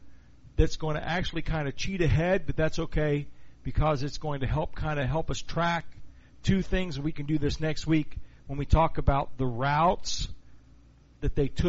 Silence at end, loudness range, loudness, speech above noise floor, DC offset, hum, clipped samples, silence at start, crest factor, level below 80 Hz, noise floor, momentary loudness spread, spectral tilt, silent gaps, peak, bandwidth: 0 s; 3 LU; -29 LUFS; 29 dB; under 0.1%; none; under 0.1%; 0 s; 18 dB; -36 dBFS; -55 dBFS; 9 LU; -5.5 dB/octave; none; -8 dBFS; 8 kHz